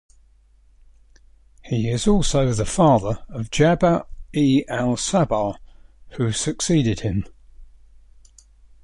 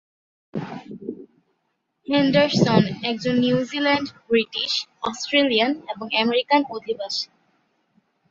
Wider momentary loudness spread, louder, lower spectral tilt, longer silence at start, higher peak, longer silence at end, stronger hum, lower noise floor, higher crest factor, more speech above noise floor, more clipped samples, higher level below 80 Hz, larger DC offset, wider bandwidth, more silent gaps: second, 11 LU vs 17 LU; about the same, -21 LUFS vs -21 LUFS; about the same, -5.5 dB/octave vs -5 dB/octave; first, 1.65 s vs 0.55 s; about the same, -4 dBFS vs -2 dBFS; first, 1.2 s vs 1.05 s; neither; second, -54 dBFS vs -74 dBFS; about the same, 18 dB vs 20 dB; second, 35 dB vs 53 dB; neither; first, -38 dBFS vs -60 dBFS; neither; first, 11.5 kHz vs 7.8 kHz; neither